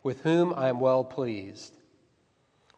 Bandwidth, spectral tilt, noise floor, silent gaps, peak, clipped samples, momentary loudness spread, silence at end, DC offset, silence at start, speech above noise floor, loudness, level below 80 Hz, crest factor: 9 kHz; -7 dB/octave; -69 dBFS; none; -14 dBFS; under 0.1%; 21 LU; 1.1 s; under 0.1%; 0.05 s; 42 dB; -27 LUFS; -76 dBFS; 16 dB